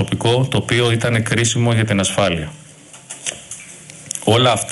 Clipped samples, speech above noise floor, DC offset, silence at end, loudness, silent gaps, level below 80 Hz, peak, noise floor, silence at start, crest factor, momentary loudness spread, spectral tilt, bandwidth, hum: under 0.1%; 22 dB; under 0.1%; 0 s; -17 LUFS; none; -46 dBFS; 0 dBFS; -38 dBFS; 0 s; 18 dB; 18 LU; -4.5 dB/octave; 12 kHz; none